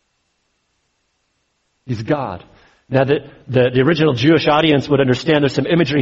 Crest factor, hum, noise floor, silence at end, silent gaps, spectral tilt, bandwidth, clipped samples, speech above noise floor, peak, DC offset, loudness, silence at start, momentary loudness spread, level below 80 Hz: 16 dB; none; -67 dBFS; 0 s; none; -7 dB/octave; 7.8 kHz; under 0.1%; 52 dB; -2 dBFS; under 0.1%; -16 LUFS; 1.85 s; 9 LU; -50 dBFS